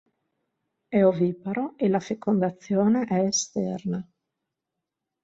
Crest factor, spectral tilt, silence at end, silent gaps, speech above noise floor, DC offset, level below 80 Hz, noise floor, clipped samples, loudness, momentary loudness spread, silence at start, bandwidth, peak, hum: 18 dB; -5.5 dB/octave; 1.2 s; none; 61 dB; under 0.1%; -68 dBFS; -85 dBFS; under 0.1%; -25 LUFS; 9 LU; 0.9 s; 7.8 kHz; -8 dBFS; none